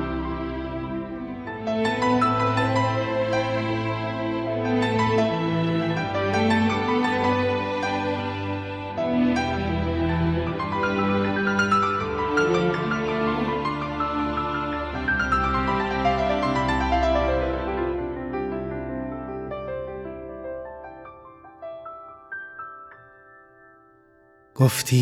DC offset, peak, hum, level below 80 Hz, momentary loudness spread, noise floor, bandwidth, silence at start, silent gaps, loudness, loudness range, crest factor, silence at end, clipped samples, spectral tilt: under 0.1%; -4 dBFS; none; -40 dBFS; 14 LU; -56 dBFS; 16.5 kHz; 0 s; none; -24 LUFS; 13 LU; 20 dB; 0 s; under 0.1%; -6 dB/octave